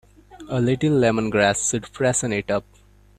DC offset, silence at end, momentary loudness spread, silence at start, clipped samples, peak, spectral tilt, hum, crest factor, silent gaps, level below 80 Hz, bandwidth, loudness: under 0.1%; 0.6 s; 7 LU; 0.3 s; under 0.1%; -4 dBFS; -4.5 dB/octave; none; 18 dB; none; -50 dBFS; 14.5 kHz; -21 LUFS